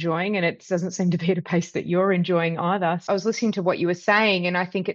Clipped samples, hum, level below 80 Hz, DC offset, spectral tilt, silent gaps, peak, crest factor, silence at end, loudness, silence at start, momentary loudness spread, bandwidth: under 0.1%; none; -68 dBFS; under 0.1%; -6 dB/octave; none; -4 dBFS; 18 dB; 0 s; -23 LUFS; 0 s; 6 LU; 7.4 kHz